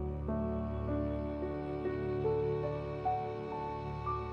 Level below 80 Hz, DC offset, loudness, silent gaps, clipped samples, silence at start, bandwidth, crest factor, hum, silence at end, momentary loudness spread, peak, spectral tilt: -46 dBFS; under 0.1%; -37 LUFS; none; under 0.1%; 0 s; 6.6 kHz; 12 dB; none; 0 s; 6 LU; -22 dBFS; -10 dB/octave